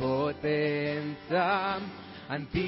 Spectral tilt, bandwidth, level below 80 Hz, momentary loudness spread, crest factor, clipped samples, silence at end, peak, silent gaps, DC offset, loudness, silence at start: -10 dB/octave; 5.8 kHz; -54 dBFS; 10 LU; 16 dB; under 0.1%; 0 s; -16 dBFS; none; under 0.1%; -30 LUFS; 0 s